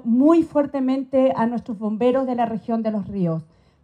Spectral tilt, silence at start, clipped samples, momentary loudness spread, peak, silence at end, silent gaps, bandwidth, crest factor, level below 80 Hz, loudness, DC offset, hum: -9 dB/octave; 0.05 s; under 0.1%; 9 LU; -4 dBFS; 0.4 s; none; 9 kHz; 16 dB; -58 dBFS; -21 LUFS; under 0.1%; none